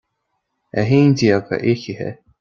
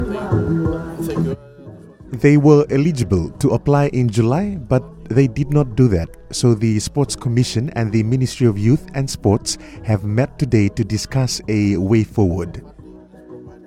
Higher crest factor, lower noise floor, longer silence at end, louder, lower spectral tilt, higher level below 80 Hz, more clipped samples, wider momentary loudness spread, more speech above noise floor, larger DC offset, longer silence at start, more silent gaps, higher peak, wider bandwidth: about the same, 18 dB vs 18 dB; first, -73 dBFS vs -40 dBFS; first, 0.3 s vs 0.1 s; about the same, -17 LUFS vs -18 LUFS; about the same, -7 dB/octave vs -6.5 dB/octave; second, -54 dBFS vs -38 dBFS; neither; first, 14 LU vs 8 LU; first, 57 dB vs 24 dB; neither; first, 0.75 s vs 0 s; neither; about the same, -2 dBFS vs 0 dBFS; second, 7.2 kHz vs 14.5 kHz